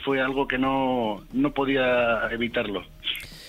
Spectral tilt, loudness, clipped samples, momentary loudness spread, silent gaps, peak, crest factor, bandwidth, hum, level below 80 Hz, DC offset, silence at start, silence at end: -5.5 dB/octave; -25 LUFS; under 0.1%; 8 LU; none; -10 dBFS; 16 dB; 15.5 kHz; none; -48 dBFS; under 0.1%; 0 s; 0 s